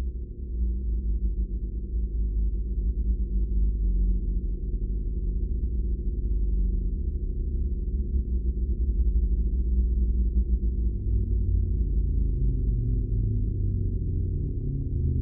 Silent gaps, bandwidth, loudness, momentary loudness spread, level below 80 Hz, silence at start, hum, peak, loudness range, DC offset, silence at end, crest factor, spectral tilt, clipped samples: none; 0.6 kHz; -29 LUFS; 5 LU; -26 dBFS; 0 s; none; -14 dBFS; 3 LU; under 0.1%; 0 s; 10 dB; -19 dB/octave; under 0.1%